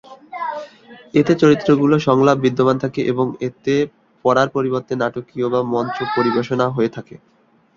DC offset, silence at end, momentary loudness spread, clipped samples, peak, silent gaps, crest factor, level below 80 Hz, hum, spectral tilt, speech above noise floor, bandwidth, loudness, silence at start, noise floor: under 0.1%; 0.6 s; 12 LU; under 0.1%; -2 dBFS; none; 16 dB; -56 dBFS; none; -7 dB/octave; 26 dB; 7.4 kHz; -18 LUFS; 0.1 s; -43 dBFS